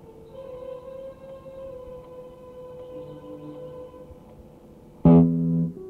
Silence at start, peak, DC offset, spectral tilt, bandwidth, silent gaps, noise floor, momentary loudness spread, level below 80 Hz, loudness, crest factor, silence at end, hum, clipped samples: 0.35 s; -6 dBFS; under 0.1%; -11.5 dB/octave; 3.3 kHz; none; -48 dBFS; 26 LU; -48 dBFS; -19 LUFS; 20 dB; 0 s; none; under 0.1%